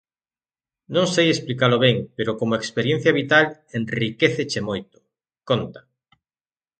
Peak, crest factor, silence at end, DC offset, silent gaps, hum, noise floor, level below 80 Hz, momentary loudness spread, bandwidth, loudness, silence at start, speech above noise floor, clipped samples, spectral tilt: -2 dBFS; 22 dB; 1 s; under 0.1%; none; none; under -90 dBFS; -58 dBFS; 10 LU; 9.2 kHz; -21 LUFS; 0.9 s; over 69 dB; under 0.1%; -5 dB/octave